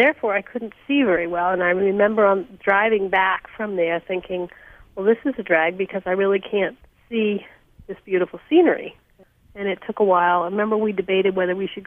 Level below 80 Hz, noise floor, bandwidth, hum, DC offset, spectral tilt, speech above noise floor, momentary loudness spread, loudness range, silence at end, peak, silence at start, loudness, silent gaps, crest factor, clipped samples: -58 dBFS; -54 dBFS; 3.7 kHz; none; under 0.1%; -8 dB/octave; 34 dB; 11 LU; 4 LU; 0 s; -4 dBFS; 0 s; -21 LUFS; none; 16 dB; under 0.1%